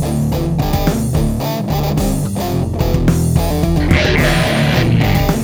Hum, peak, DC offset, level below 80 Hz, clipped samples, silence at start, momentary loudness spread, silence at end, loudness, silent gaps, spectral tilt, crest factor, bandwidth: none; 0 dBFS; under 0.1%; -22 dBFS; under 0.1%; 0 s; 5 LU; 0 s; -15 LUFS; none; -6 dB/octave; 14 dB; 19 kHz